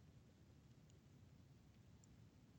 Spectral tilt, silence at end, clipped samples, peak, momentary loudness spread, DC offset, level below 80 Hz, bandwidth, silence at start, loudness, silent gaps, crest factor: -6 dB/octave; 0 s; under 0.1%; -52 dBFS; 1 LU; under 0.1%; -76 dBFS; 19 kHz; 0 s; -68 LUFS; none; 14 dB